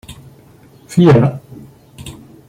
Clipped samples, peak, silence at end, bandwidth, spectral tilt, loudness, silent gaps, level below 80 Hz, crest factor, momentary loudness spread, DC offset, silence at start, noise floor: under 0.1%; -2 dBFS; 0.4 s; 14.5 kHz; -8 dB/octave; -12 LUFS; none; -46 dBFS; 16 dB; 24 LU; under 0.1%; 0.1 s; -44 dBFS